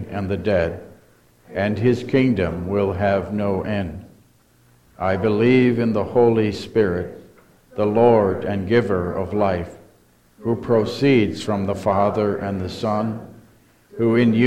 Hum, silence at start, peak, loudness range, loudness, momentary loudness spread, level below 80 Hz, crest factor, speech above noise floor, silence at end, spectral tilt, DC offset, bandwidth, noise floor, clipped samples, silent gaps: none; 0 s; -2 dBFS; 3 LU; -20 LUFS; 11 LU; -48 dBFS; 18 dB; 37 dB; 0 s; -8 dB/octave; under 0.1%; 12.5 kHz; -56 dBFS; under 0.1%; none